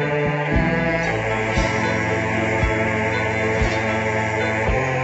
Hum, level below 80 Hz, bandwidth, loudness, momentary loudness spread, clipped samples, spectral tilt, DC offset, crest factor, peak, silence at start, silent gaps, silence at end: none; -32 dBFS; 8.2 kHz; -20 LUFS; 1 LU; under 0.1%; -6 dB/octave; under 0.1%; 14 dB; -6 dBFS; 0 s; none; 0 s